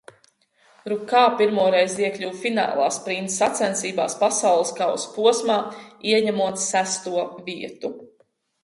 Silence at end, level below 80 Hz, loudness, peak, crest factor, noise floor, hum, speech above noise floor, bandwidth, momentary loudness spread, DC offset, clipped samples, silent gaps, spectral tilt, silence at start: 0.55 s; -72 dBFS; -22 LUFS; -6 dBFS; 18 dB; -64 dBFS; none; 42 dB; 11.5 kHz; 13 LU; under 0.1%; under 0.1%; none; -2.5 dB/octave; 0.85 s